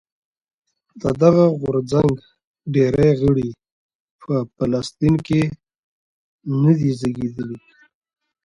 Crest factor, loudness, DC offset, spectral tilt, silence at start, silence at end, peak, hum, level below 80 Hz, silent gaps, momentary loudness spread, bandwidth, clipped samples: 18 dB; -19 LUFS; under 0.1%; -8.5 dB/octave; 0.95 s; 0.9 s; -2 dBFS; none; -46 dBFS; 2.45-2.54 s, 3.72-3.89 s, 3.95-4.19 s, 5.78-6.39 s; 14 LU; 11 kHz; under 0.1%